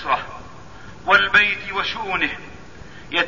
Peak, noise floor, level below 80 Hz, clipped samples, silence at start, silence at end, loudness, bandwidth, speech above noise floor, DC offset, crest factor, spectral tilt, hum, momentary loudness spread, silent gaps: -2 dBFS; -41 dBFS; -48 dBFS; under 0.1%; 0 s; 0 s; -18 LUFS; 7.4 kHz; 22 dB; 0.9%; 20 dB; -3.5 dB/octave; none; 21 LU; none